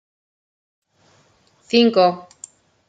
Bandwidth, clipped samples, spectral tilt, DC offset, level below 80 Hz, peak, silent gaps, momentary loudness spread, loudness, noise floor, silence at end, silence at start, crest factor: 9.4 kHz; under 0.1%; -5 dB/octave; under 0.1%; -72 dBFS; -2 dBFS; none; 26 LU; -16 LUFS; -58 dBFS; 0.65 s; 1.75 s; 20 dB